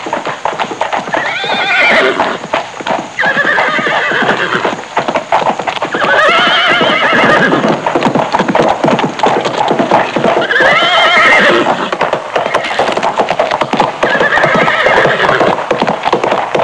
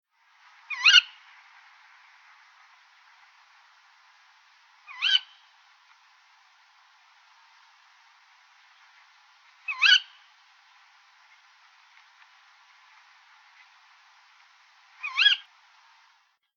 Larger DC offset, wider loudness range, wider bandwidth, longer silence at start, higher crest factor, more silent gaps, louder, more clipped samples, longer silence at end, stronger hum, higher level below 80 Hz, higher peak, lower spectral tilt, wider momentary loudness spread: neither; second, 3 LU vs 7 LU; first, 10.5 kHz vs 7.4 kHz; second, 0 s vs 0.7 s; second, 10 dB vs 28 dB; neither; first, -10 LUFS vs -21 LUFS; neither; second, 0 s vs 1.2 s; neither; first, -46 dBFS vs under -90 dBFS; first, 0 dBFS vs -4 dBFS; first, -4 dB/octave vs 10.5 dB/octave; second, 8 LU vs 24 LU